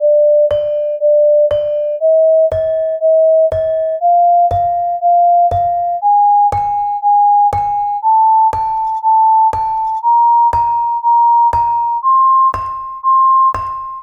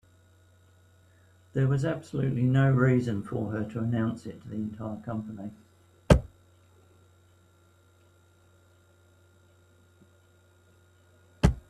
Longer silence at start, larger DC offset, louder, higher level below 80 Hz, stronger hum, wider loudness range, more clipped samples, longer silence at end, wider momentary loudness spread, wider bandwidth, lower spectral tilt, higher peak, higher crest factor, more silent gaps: second, 0 s vs 1.55 s; neither; first, -12 LUFS vs -28 LUFS; about the same, -42 dBFS vs -42 dBFS; neither; second, 1 LU vs 6 LU; neither; about the same, 0 s vs 0.1 s; second, 6 LU vs 16 LU; second, 6.2 kHz vs 11 kHz; second, -6.5 dB/octave vs -8 dB/octave; about the same, -6 dBFS vs -4 dBFS; second, 6 dB vs 26 dB; neither